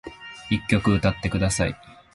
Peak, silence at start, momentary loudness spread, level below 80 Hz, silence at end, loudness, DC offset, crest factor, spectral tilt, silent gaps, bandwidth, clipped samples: -4 dBFS; 0.05 s; 18 LU; -38 dBFS; 0.2 s; -23 LUFS; under 0.1%; 20 dB; -5.5 dB/octave; none; 11.5 kHz; under 0.1%